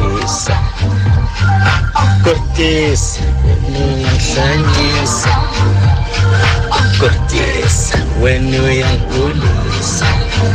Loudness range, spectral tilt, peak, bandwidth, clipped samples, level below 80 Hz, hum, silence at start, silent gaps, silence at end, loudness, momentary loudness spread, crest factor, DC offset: 1 LU; -5 dB/octave; 0 dBFS; 9.8 kHz; under 0.1%; -20 dBFS; none; 0 s; none; 0 s; -13 LUFS; 4 LU; 10 dB; under 0.1%